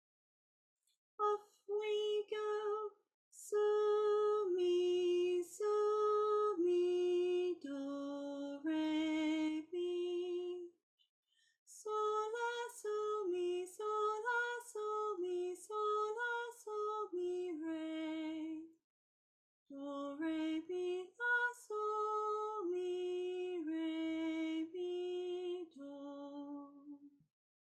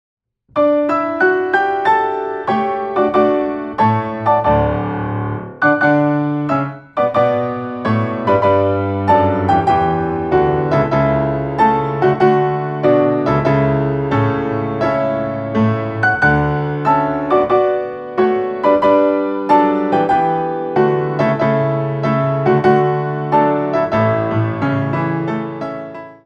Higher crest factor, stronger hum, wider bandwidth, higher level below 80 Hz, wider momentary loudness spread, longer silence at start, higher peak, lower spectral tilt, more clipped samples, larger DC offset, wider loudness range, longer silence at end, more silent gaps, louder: about the same, 14 dB vs 14 dB; neither; first, 12.5 kHz vs 7.8 kHz; second, -90 dBFS vs -40 dBFS; first, 13 LU vs 6 LU; first, 1.2 s vs 0.55 s; second, -26 dBFS vs 0 dBFS; second, -3 dB/octave vs -9 dB/octave; neither; neither; first, 9 LU vs 2 LU; first, 0.6 s vs 0.1 s; first, 3.14-3.31 s, 10.83-10.98 s, 11.09-11.23 s, 11.58-11.66 s, 18.84-19.66 s vs none; second, -39 LUFS vs -16 LUFS